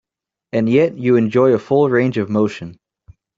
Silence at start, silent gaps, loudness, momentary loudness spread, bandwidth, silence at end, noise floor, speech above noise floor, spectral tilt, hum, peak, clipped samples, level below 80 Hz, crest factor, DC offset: 0.55 s; none; -16 LUFS; 9 LU; 7.6 kHz; 0.65 s; -65 dBFS; 50 dB; -8.5 dB/octave; none; -2 dBFS; under 0.1%; -56 dBFS; 14 dB; under 0.1%